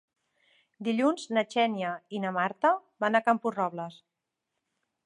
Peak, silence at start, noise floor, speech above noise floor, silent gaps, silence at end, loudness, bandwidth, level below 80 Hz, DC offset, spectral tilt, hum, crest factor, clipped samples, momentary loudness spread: -8 dBFS; 0.8 s; -85 dBFS; 57 dB; none; 1.1 s; -28 LUFS; 11 kHz; -84 dBFS; under 0.1%; -5.5 dB/octave; none; 22 dB; under 0.1%; 8 LU